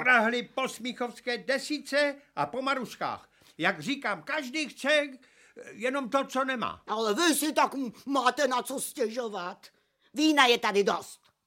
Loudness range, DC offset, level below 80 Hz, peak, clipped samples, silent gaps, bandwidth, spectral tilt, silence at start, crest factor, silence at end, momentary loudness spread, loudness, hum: 4 LU; under 0.1%; -76 dBFS; -6 dBFS; under 0.1%; none; 16.5 kHz; -2.5 dB/octave; 0 s; 24 dB; 0.3 s; 11 LU; -28 LUFS; none